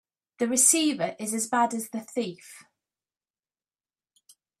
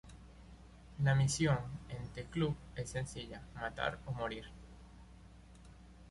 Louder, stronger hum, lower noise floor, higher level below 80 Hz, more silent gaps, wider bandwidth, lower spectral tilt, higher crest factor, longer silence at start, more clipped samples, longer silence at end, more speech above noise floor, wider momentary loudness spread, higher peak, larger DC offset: first, -25 LUFS vs -38 LUFS; neither; first, under -90 dBFS vs -57 dBFS; second, -78 dBFS vs -56 dBFS; neither; first, 15.5 kHz vs 11.5 kHz; second, -2 dB/octave vs -5.5 dB/octave; first, 24 dB vs 18 dB; first, 0.4 s vs 0.05 s; neither; first, 2 s vs 0 s; first, over 64 dB vs 20 dB; second, 14 LU vs 26 LU; first, -6 dBFS vs -20 dBFS; neither